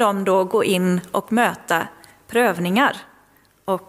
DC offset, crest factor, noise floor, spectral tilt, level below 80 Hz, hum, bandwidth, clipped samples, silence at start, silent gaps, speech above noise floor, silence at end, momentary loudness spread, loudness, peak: under 0.1%; 18 dB; -56 dBFS; -5 dB/octave; -64 dBFS; none; 16 kHz; under 0.1%; 0 s; none; 37 dB; 0.1 s; 8 LU; -20 LUFS; -4 dBFS